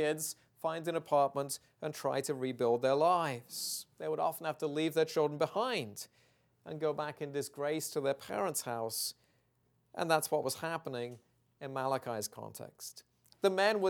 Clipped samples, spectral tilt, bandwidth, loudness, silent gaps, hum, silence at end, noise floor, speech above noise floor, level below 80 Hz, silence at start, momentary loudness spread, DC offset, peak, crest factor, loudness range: under 0.1%; -4 dB/octave; 19 kHz; -35 LUFS; none; none; 0 s; -75 dBFS; 40 dB; -82 dBFS; 0 s; 14 LU; under 0.1%; -14 dBFS; 22 dB; 4 LU